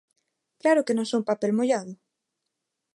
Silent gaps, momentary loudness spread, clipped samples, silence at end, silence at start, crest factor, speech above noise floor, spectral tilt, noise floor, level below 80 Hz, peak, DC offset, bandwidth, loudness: none; 6 LU; under 0.1%; 1 s; 0.65 s; 18 dB; 59 dB; -5 dB/octave; -82 dBFS; -80 dBFS; -8 dBFS; under 0.1%; 11.5 kHz; -25 LUFS